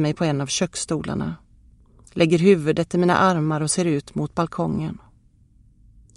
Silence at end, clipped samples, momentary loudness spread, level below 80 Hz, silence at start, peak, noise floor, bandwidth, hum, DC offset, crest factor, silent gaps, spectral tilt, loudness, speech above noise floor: 1.2 s; under 0.1%; 13 LU; -50 dBFS; 0 s; -4 dBFS; -55 dBFS; 11.5 kHz; none; under 0.1%; 18 dB; none; -5.5 dB/octave; -21 LUFS; 34 dB